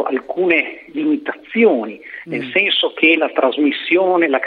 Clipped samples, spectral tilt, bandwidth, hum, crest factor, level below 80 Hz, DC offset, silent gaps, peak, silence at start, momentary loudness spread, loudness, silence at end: under 0.1%; -7 dB/octave; 5 kHz; none; 14 dB; -66 dBFS; under 0.1%; none; -2 dBFS; 0 s; 11 LU; -16 LUFS; 0 s